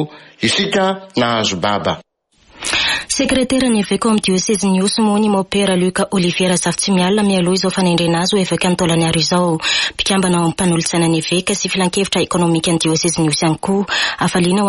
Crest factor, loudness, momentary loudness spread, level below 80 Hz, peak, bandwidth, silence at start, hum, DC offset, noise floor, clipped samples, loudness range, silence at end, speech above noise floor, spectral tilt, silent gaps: 12 dB; -15 LUFS; 3 LU; -44 dBFS; -4 dBFS; 11.5 kHz; 0 s; none; under 0.1%; -54 dBFS; under 0.1%; 2 LU; 0 s; 39 dB; -4 dB/octave; none